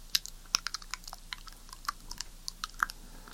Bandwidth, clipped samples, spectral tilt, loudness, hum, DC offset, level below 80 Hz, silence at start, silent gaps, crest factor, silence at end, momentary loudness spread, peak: 17 kHz; under 0.1%; 1 dB/octave; -37 LUFS; none; under 0.1%; -50 dBFS; 0 s; none; 32 dB; 0 s; 12 LU; -6 dBFS